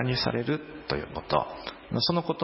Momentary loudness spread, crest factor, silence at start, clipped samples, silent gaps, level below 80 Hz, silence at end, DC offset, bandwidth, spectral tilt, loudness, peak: 7 LU; 20 dB; 0 s; under 0.1%; none; -50 dBFS; 0 s; under 0.1%; 5.8 kHz; -9 dB/octave; -29 LUFS; -8 dBFS